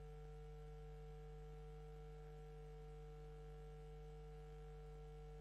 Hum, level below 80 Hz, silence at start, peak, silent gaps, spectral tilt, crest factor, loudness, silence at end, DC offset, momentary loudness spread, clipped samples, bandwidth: none; -58 dBFS; 0 s; -48 dBFS; none; -7.5 dB/octave; 8 dB; -58 LUFS; 0 s; under 0.1%; 0 LU; under 0.1%; 12 kHz